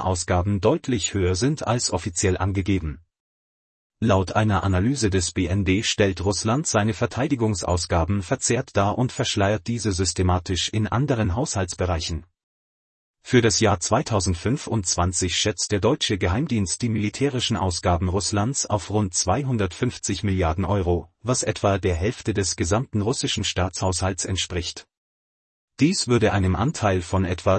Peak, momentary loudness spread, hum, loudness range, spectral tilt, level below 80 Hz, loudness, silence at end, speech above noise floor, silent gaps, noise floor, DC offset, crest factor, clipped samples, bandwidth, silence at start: -4 dBFS; 4 LU; none; 2 LU; -4.5 dB/octave; -44 dBFS; -23 LUFS; 0 s; over 68 dB; 3.20-3.90 s, 12.43-13.14 s, 24.97-25.68 s; under -90 dBFS; under 0.1%; 18 dB; under 0.1%; 8.8 kHz; 0 s